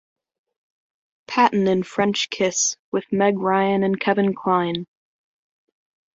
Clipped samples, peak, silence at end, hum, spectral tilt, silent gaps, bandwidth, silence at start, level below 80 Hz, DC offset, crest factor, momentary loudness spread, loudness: under 0.1%; -2 dBFS; 1.3 s; none; -4 dB/octave; 2.79-2.92 s; 7.8 kHz; 1.3 s; -64 dBFS; under 0.1%; 20 dB; 7 LU; -21 LUFS